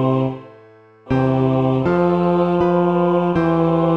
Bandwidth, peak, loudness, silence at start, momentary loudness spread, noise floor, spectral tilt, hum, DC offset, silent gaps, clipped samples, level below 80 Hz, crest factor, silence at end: 5.8 kHz; -4 dBFS; -17 LUFS; 0 s; 4 LU; -46 dBFS; -10 dB/octave; none; 0.3%; none; under 0.1%; -46 dBFS; 12 dB; 0 s